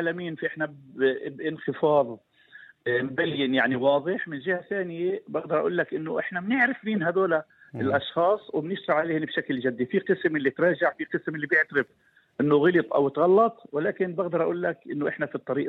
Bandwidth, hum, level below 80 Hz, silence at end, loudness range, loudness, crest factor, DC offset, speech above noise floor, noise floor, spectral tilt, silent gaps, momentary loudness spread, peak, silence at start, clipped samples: 4.6 kHz; none; -72 dBFS; 0 s; 3 LU; -26 LUFS; 18 dB; under 0.1%; 26 dB; -52 dBFS; -8.5 dB/octave; none; 9 LU; -8 dBFS; 0 s; under 0.1%